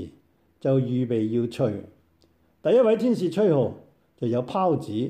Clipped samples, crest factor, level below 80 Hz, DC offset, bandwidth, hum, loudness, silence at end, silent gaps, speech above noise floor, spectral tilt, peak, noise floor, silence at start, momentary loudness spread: under 0.1%; 14 dB; -66 dBFS; under 0.1%; 13 kHz; none; -24 LUFS; 0 s; none; 40 dB; -8.5 dB/octave; -10 dBFS; -63 dBFS; 0 s; 10 LU